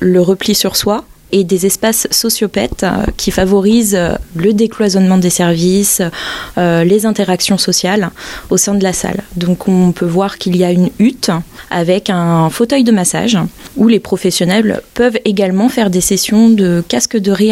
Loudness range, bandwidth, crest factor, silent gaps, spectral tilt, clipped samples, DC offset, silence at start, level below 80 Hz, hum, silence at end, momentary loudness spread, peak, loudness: 2 LU; 16.5 kHz; 12 dB; none; -4.5 dB/octave; under 0.1%; under 0.1%; 0 s; -36 dBFS; none; 0 s; 6 LU; 0 dBFS; -12 LUFS